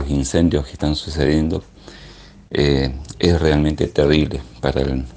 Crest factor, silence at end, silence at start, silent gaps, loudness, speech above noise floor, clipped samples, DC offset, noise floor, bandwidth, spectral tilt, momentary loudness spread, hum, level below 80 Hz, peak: 18 dB; 0 s; 0 s; none; -19 LUFS; 24 dB; under 0.1%; under 0.1%; -41 dBFS; 9.8 kHz; -6 dB/octave; 8 LU; none; -30 dBFS; 0 dBFS